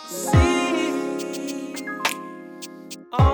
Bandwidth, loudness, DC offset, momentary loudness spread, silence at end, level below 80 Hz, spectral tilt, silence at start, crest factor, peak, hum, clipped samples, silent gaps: over 20 kHz; -23 LUFS; under 0.1%; 19 LU; 0 s; -32 dBFS; -5.5 dB/octave; 0 s; 18 dB; -6 dBFS; none; under 0.1%; none